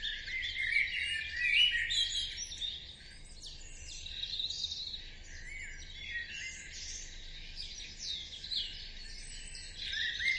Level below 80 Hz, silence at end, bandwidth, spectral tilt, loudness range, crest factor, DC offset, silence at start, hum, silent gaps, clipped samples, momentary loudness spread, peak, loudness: -52 dBFS; 0 s; 11.5 kHz; 0.5 dB/octave; 10 LU; 20 dB; under 0.1%; 0 s; none; none; under 0.1%; 17 LU; -16 dBFS; -35 LUFS